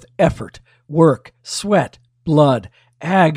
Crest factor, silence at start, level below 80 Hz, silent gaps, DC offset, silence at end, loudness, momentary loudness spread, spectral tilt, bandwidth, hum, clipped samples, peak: 16 dB; 0.2 s; -44 dBFS; none; under 0.1%; 0 s; -17 LUFS; 16 LU; -6.5 dB/octave; 15 kHz; none; under 0.1%; 0 dBFS